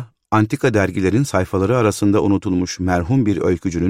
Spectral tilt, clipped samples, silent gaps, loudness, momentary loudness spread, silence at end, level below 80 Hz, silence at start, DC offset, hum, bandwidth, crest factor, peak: -6.5 dB/octave; under 0.1%; none; -18 LUFS; 4 LU; 0 s; -42 dBFS; 0 s; 0.3%; none; 15.5 kHz; 14 dB; -2 dBFS